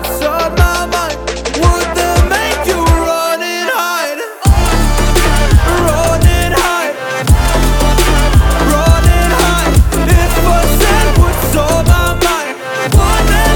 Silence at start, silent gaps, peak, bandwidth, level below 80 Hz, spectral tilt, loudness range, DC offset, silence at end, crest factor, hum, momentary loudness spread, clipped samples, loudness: 0 s; none; 0 dBFS; 20 kHz; -14 dBFS; -4.5 dB/octave; 2 LU; under 0.1%; 0 s; 10 dB; none; 5 LU; under 0.1%; -12 LUFS